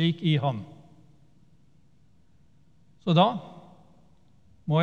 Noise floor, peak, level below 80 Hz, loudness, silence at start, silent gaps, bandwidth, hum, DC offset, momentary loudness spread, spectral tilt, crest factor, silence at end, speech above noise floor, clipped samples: -62 dBFS; -8 dBFS; -68 dBFS; -26 LUFS; 0 s; none; 6.8 kHz; none; 0.1%; 21 LU; -8.5 dB/octave; 22 dB; 0 s; 39 dB; under 0.1%